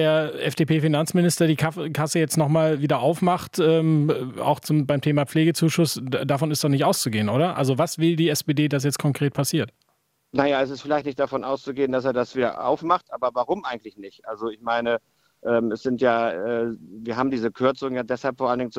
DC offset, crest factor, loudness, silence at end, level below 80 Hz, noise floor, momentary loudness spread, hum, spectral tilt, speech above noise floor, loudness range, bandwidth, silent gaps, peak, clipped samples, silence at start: under 0.1%; 20 dB; -23 LUFS; 0 s; -64 dBFS; -69 dBFS; 7 LU; none; -5.5 dB/octave; 47 dB; 4 LU; 16 kHz; none; -4 dBFS; under 0.1%; 0 s